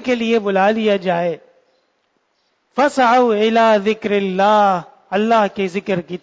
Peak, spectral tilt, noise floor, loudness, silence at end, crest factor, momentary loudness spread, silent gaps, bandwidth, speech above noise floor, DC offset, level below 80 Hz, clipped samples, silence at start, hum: -2 dBFS; -5.5 dB/octave; -65 dBFS; -16 LUFS; 0.05 s; 14 dB; 10 LU; none; 8 kHz; 50 dB; under 0.1%; -62 dBFS; under 0.1%; 0 s; none